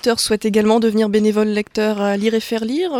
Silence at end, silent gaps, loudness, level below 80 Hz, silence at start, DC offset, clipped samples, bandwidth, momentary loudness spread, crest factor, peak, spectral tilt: 0 s; none; -17 LUFS; -52 dBFS; 0.05 s; under 0.1%; under 0.1%; 16 kHz; 5 LU; 14 dB; -2 dBFS; -4.5 dB/octave